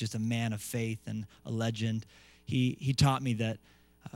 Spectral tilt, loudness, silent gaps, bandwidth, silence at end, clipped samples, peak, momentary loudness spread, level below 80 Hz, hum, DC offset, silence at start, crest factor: -5.5 dB/octave; -33 LUFS; none; 16 kHz; 0.05 s; under 0.1%; -14 dBFS; 13 LU; -58 dBFS; none; under 0.1%; 0 s; 20 dB